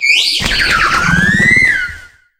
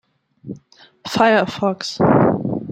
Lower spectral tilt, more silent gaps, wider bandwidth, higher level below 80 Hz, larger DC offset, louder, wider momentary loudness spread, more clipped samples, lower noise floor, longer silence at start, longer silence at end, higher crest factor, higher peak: second, -2.5 dB/octave vs -6 dB/octave; neither; first, 17 kHz vs 15 kHz; first, -30 dBFS vs -52 dBFS; neither; first, -9 LUFS vs -17 LUFS; second, 5 LU vs 21 LU; neither; second, -33 dBFS vs -48 dBFS; second, 0 s vs 0.45 s; first, 0.35 s vs 0 s; second, 12 dB vs 18 dB; about the same, 0 dBFS vs -2 dBFS